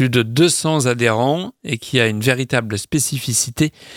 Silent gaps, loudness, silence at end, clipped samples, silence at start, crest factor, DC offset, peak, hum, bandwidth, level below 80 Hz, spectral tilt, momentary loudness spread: none; -17 LUFS; 0 s; under 0.1%; 0 s; 18 dB; under 0.1%; 0 dBFS; none; 17 kHz; -50 dBFS; -4 dB/octave; 6 LU